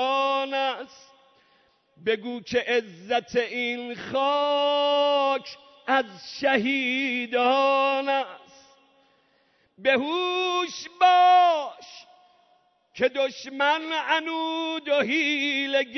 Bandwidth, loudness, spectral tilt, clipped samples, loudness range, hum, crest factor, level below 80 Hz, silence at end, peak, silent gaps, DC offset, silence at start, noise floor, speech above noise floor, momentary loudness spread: 6.4 kHz; -24 LUFS; -3 dB/octave; under 0.1%; 5 LU; none; 18 dB; -72 dBFS; 0 s; -8 dBFS; none; under 0.1%; 0 s; -65 dBFS; 41 dB; 9 LU